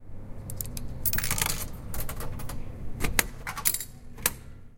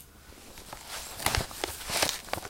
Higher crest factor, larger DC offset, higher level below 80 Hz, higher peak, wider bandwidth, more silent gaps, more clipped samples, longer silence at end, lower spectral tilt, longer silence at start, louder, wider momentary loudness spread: about the same, 30 dB vs 30 dB; neither; first, -38 dBFS vs -46 dBFS; first, 0 dBFS vs -6 dBFS; about the same, 17 kHz vs 17 kHz; neither; neither; about the same, 0 s vs 0 s; about the same, -2.5 dB/octave vs -2 dB/octave; about the same, 0 s vs 0 s; about the same, -30 LUFS vs -31 LUFS; second, 14 LU vs 20 LU